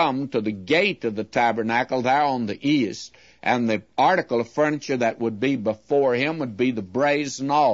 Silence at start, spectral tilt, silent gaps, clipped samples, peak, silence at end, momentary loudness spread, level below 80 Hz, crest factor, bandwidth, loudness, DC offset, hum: 0 s; -5.5 dB/octave; none; under 0.1%; -6 dBFS; 0 s; 6 LU; -64 dBFS; 16 dB; 8 kHz; -23 LUFS; under 0.1%; none